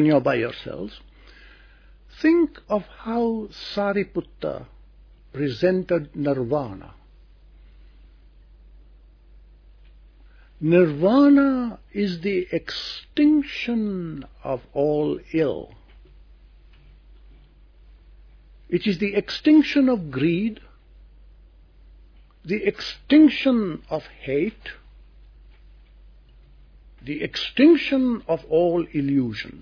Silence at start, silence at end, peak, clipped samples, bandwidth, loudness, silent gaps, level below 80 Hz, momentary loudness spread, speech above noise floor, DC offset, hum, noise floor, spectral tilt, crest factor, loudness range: 0 s; 0 s; -4 dBFS; under 0.1%; 5.4 kHz; -22 LUFS; none; -50 dBFS; 15 LU; 29 dB; under 0.1%; none; -50 dBFS; -7.5 dB/octave; 20 dB; 10 LU